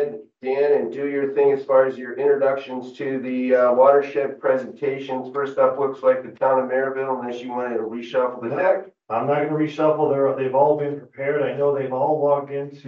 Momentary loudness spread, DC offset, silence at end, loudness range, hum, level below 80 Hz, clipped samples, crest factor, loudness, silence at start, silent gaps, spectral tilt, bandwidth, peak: 9 LU; under 0.1%; 0 s; 3 LU; none; -82 dBFS; under 0.1%; 18 dB; -21 LUFS; 0 s; none; -8 dB/octave; 6.8 kHz; -2 dBFS